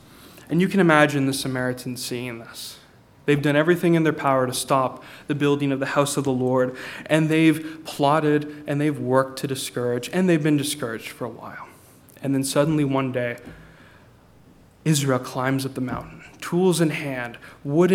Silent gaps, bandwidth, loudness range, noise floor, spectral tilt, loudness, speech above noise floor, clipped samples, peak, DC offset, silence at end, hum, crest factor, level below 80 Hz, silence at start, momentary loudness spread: none; 17 kHz; 5 LU; -52 dBFS; -5.5 dB/octave; -22 LUFS; 30 dB; under 0.1%; 0 dBFS; under 0.1%; 0 s; none; 22 dB; -58 dBFS; 0.2 s; 15 LU